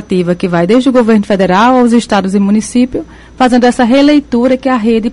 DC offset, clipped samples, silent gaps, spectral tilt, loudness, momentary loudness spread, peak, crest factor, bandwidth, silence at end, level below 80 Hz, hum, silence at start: under 0.1%; under 0.1%; none; -6 dB/octave; -9 LUFS; 5 LU; 0 dBFS; 8 dB; 11.5 kHz; 0 s; -38 dBFS; none; 0 s